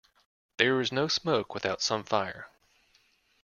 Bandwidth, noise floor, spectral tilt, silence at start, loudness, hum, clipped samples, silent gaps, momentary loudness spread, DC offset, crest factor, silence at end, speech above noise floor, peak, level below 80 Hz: 7.2 kHz; -67 dBFS; -3.5 dB/octave; 0.6 s; -28 LUFS; none; under 0.1%; none; 18 LU; under 0.1%; 24 dB; 0.95 s; 38 dB; -6 dBFS; -68 dBFS